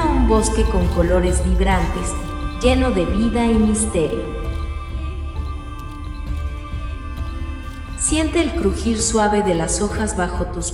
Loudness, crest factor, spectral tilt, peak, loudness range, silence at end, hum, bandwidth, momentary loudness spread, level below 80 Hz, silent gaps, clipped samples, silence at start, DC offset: -20 LUFS; 16 dB; -5 dB/octave; -2 dBFS; 10 LU; 0 s; none; 12 kHz; 13 LU; -24 dBFS; none; under 0.1%; 0 s; under 0.1%